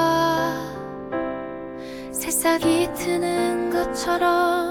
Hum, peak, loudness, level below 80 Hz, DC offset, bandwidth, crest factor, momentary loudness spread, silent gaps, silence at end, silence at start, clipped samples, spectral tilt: none; -8 dBFS; -23 LUFS; -50 dBFS; under 0.1%; 19.5 kHz; 14 dB; 14 LU; none; 0 s; 0 s; under 0.1%; -3.5 dB/octave